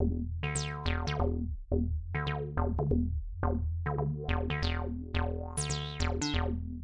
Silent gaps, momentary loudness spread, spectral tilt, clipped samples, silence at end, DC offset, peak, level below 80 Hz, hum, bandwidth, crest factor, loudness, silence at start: none; 3 LU; -5.5 dB/octave; under 0.1%; 0 s; under 0.1%; -18 dBFS; -38 dBFS; none; 11 kHz; 14 dB; -34 LUFS; 0 s